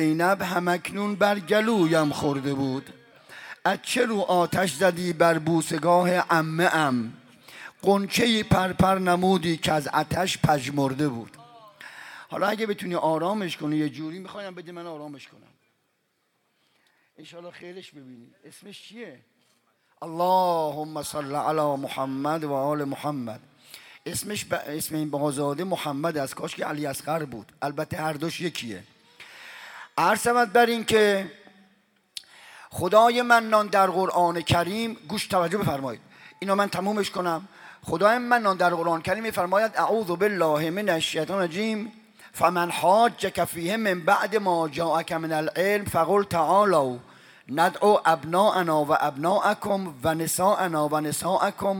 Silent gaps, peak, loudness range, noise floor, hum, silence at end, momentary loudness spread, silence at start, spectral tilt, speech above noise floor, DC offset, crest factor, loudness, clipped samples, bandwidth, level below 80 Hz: none; -4 dBFS; 8 LU; -72 dBFS; none; 0 s; 18 LU; 0 s; -5 dB/octave; 48 dB; under 0.1%; 20 dB; -24 LUFS; under 0.1%; 19 kHz; -58 dBFS